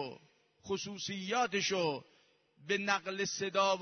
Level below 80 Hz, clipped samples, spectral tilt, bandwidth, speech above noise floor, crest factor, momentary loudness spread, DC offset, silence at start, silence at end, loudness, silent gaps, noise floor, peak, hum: -76 dBFS; under 0.1%; -3 dB/octave; 6.6 kHz; 34 dB; 20 dB; 10 LU; under 0.1%; 0 s; 0 s; -35 LUFS; none; -68 dBFS; -16 dBFS; none